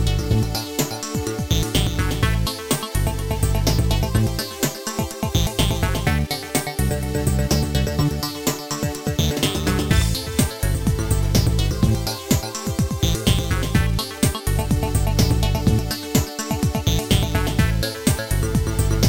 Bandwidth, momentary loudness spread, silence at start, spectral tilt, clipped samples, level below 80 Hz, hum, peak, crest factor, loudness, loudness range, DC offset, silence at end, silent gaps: 17 kHz; 5 LU; 0 s; -5 dB/octave; under 0.1%; -26 dBFS; none; -2 dBFS; 18 dB; -21 LUFS; 2 LU; 0.6%; 0 s; none